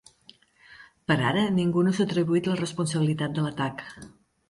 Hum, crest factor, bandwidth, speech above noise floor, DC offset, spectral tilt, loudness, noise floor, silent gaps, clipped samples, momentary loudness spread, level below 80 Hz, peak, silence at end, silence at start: none; 16 dB; 11.5 kHz; 32 dB; under 0.1%; -6 dB/octave; -25 LUFS; -57 dBFS; none; under 0.1%; 13 LU; -62 dBFS; -10 dBFS; 0.4 s; 0.8 s